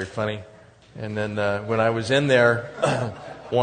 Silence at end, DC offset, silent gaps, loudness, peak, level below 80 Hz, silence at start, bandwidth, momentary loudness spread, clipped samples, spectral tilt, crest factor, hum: 0 s; under 0.1%; none; -23 LUFS; -4 dBFS; -58 dBFS; 0 s; 9.6 kHz; 14 LU; under 0.1%; -5.5 dB/octave; 20 dB; none